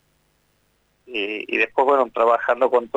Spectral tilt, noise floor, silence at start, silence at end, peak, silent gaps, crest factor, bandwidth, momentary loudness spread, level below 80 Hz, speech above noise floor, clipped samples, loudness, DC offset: -4.5 dB/octave; -65 dBFS; 1.1 s; 0.1 s; -6 dBFS; none; 16 dB; 8 kHz; 8 LU; -64 dBFS; 46 dB; under 0.1%; -20 LUFS; under 0.1%